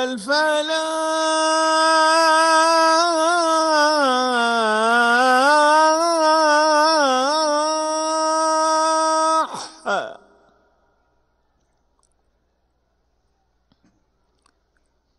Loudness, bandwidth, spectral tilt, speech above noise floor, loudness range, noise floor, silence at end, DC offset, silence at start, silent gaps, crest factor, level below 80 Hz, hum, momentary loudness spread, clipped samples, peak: -17 LUFS; 12 kHz; -1 dB/octave; 49 dB; 9 LU; -67 dBFS; 5.05 s; under 0.1%; 0 s; none; 14 dB; -68 dBFS; none; 7 LU; under 0.1%; -4 dBFS